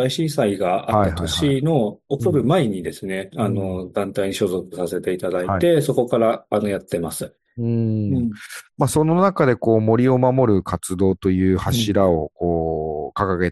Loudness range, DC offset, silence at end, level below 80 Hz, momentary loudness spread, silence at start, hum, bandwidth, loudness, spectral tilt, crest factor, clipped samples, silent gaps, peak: 4 LU; under 0.1%; 0 s; -48 dBFS; 9 LU; 0 s; none; 12.5 kHz; -20 LUFS; -6.5 dB/octave; 18 dB; under 0.1%; none; -2 dBFS